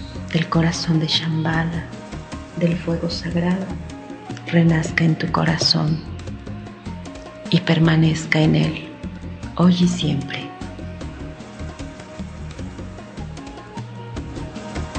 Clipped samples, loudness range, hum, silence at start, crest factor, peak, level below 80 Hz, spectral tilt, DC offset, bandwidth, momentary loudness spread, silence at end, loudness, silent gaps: under 0.1%; 14 LU; none; 0 s; 22 dB; 0 dBFS; -40 dBFS; -6 dB/octave; under 0.1%; 9 kHz; 18 LU; 0 s; -20 LUFS; none